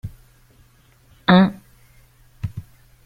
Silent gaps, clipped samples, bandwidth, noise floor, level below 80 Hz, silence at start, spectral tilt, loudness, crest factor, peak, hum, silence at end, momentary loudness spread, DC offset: none; under 0.1%; 5 kHz; -54 dBFS; -50 dBFS; 0.05 s; -8 dB/octave; -18 LUFS; 22 dB; -2 dBFS; none; 0.45 s; 23 LU; under 0.1%